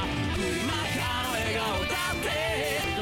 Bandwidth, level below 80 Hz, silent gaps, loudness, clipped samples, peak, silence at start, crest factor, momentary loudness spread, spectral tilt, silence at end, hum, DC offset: 19 kHz; -44 dBFS; none; -28 LUFS; under 0.1%; -18 dBFS; 0 s; 10 dB; 1 LU; -4 dB/octave; 0 s; none; under 0.1%